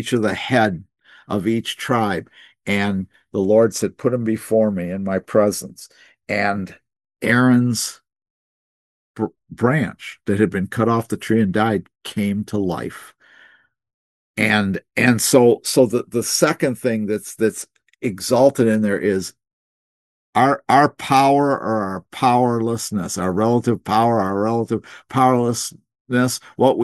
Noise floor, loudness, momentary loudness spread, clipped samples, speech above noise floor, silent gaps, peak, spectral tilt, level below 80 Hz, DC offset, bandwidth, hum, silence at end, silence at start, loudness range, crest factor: -53 dBFS; -19 LUFS; 12 LU; under 0.1%; 35 dB; 8.30-9.14 s, 13.94-14.34 s, 19.53-20.33 s, 26.00-26.05 s; 0 dBFS; -5 dB/octave; -62 dBFS; under 0.1%; 12.5 kHz; none; 0 s; 0 s; 4 LU; 20 dB